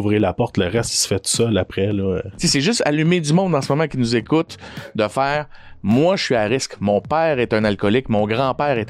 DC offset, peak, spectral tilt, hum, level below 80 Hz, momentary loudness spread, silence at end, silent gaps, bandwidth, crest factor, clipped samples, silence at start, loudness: under 0.1%; -6 dBFS; -5 dB/octave; none; -46 dBFS; 5 LU; 0 s; none; 15 kHz; 14 dB; under 0.1%; 0 s; -19 LUFS